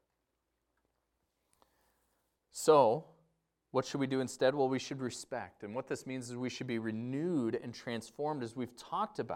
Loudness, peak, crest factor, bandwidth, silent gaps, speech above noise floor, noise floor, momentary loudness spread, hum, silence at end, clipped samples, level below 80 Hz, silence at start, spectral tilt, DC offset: -35 LUFS; -12 dBFS; 24 dB; 16.5 kHz; none; 49 dB; -84 dBFS; 14 LU; none; 0 s; under 0.1%; -78 dBFS; 2.55 s; -5.5 dB/octave; under 0.1%